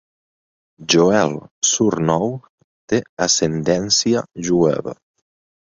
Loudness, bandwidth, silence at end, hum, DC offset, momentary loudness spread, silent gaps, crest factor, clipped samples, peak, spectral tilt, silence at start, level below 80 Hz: -18 LUFS; 7.8 kHz; 0.75 s; none; under 0.1%; 10 LU; 1.51-1.62 s, 2.49-2.58 s, 2.64-2.88 s, 3.09-3.17 s; 18 dB; under 0.1%; -2 dBFS; -3.5 dB/octave; 0.8 s; -52 dBFS